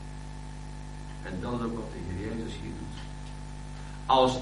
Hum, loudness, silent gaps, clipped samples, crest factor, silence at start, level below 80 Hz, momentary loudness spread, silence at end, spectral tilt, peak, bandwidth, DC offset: none; -34 LUFS; none; under 0.1%; 22 dB; 0 s; -42 dBFS; 16 LU; 0 s; -5.5 dB/octave; -10 dBFS; 10.5 kHz; under 0.1%